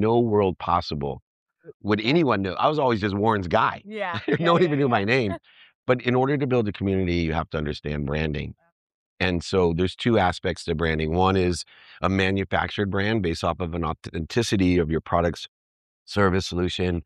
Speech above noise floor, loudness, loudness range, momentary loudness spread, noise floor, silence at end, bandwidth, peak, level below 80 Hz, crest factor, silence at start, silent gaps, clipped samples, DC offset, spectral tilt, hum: over 67 dB; -24 LUFS; 3 LU; 9 LU; under -90 dBFS; 0.05 s; 12 kHz; -6 dBFS; -44 dBFS; 18 dB; 0 s; 1.22-1.46 s, 1.74-1.80 s, 5.75-5.83 s, 8.72-8.87 s, 8.94-9.17 s, 15.48-16.06 s; under 0.1%; under 0.1%; -6.5 dB/octave; none